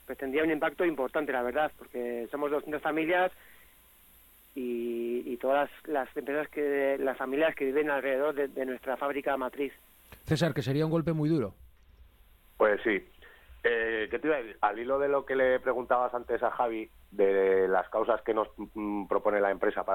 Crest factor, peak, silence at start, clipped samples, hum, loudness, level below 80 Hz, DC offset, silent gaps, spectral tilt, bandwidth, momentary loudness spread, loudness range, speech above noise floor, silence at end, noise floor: 18 dB; -12 dBFS; 0.1 s; under 0.1%; none; -30 LUFS; -60 dBFS; under 0.1%; none; -7 dB/octave; 17.5 kHz; 8 LU; 4 LU; 30 dB; 0 s; -59 dBFS